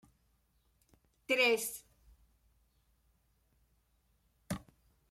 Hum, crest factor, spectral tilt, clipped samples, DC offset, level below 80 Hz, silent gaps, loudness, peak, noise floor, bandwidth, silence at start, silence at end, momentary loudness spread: none; 24 dB; -2.5 dB/octave; under 0.1%; under 0.1%; -68 dBFS; none; -33 LUFS; -18 dBFS; -75 dBFS; 16 kHz; 1.3 s; 0.5 s; 16 LU